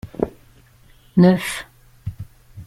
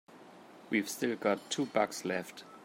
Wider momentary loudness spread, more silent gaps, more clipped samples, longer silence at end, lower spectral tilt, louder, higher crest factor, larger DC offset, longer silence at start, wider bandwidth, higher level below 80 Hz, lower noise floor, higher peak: first, 25 LU vs 22 LU; neither; neither; about the same, 0.05 s vs 0 s; first, -7 dB/octave vs -4 dB/octave; first, -19 LUFS vs -34 LUFS; about the same, 20 dB vs 20 dB; neither; about the same, 0.05 s vs 0.1 s; second, 13.5 kHz vs 16.5 kHz; first, -46 dBFS vs -84 dBFS; about the same, -51 dBFS vs -54 dBFS; first, -2 dBFS vs -14 dBFS